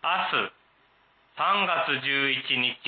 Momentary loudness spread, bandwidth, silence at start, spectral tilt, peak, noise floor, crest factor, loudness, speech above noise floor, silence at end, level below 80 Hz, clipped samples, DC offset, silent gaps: 5 LU; 4.8 kHz; 0.05 s; -7.5 dB/octave; -12 dBFS; -63 dBFS; 16 dB; -25 LUFS; 37 dB; 0 s; -80 dBFS; under 0.1%; under 0.1%; none